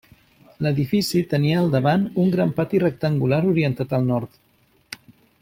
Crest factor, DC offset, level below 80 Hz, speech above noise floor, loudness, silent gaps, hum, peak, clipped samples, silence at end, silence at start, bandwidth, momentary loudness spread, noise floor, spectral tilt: 16 dB; under 0.1%; -56 dBFS; 41 dB; -21 LUFS; none; none; -6 dBFS; under 0.1%; 0.45 s; 0.6 s; 16.5 kHz; 16 LU; -61 dBFS; -7 dB/octave